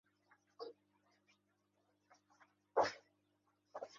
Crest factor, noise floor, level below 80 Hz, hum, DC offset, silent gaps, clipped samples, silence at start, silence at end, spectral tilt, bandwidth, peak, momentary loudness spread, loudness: 26 dB; -82 dBFS; -88 dBFS; 50 Hz at -85 dBFS; under 0.1%; none; under 0.1%; 0.6 s; 0 s; -1 dB/octave; 7.2 kHz; -22 dBFS; 18 LU; -40 LUFS